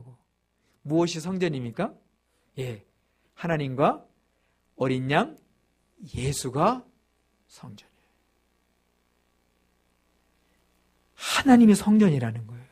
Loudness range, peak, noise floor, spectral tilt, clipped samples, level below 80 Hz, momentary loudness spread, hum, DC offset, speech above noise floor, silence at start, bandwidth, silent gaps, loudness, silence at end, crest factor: 9 LU; -4 dBFS; -71 dBFS; -6 dB/octave; under 0.1%; -56 dBFS; 21 LU; none; under 0.1%; 48 dB; 0.05 s; 15 kHz; none; -24 LUFS; 0.1 s; 22 dB